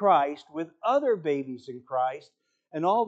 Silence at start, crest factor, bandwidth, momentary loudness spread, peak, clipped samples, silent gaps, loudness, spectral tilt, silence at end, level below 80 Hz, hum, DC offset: 0 s; 18 dB; 8 kHz; 15 LU; -8 dBFS; under 0.1%; none; -28 LUFS; -6.5 dB/octave; 0 s; -80 dBFS; none; under 0.1%